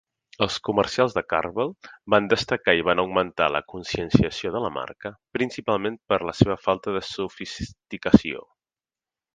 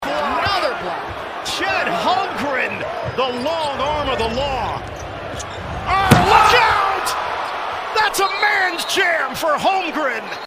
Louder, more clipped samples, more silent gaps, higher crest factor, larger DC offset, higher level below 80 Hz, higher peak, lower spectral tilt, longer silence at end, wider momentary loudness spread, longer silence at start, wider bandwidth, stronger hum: second, -24 LUFS vs -18 LUFS; neither; neither; first, 24 dB vs 18 dB; neither; second, -46 dBFS vs -40 dBFS; about the same, 0 dBFS vs 0 dBFS; first, -6 dB/octave vs -4 dB/octave; first, 0.95 s vs 0 s; about the same, 13 LU vs 13 LU; first, 0.4 s vs 0 s; second, 9.6 kHz vs 16 kHz; neither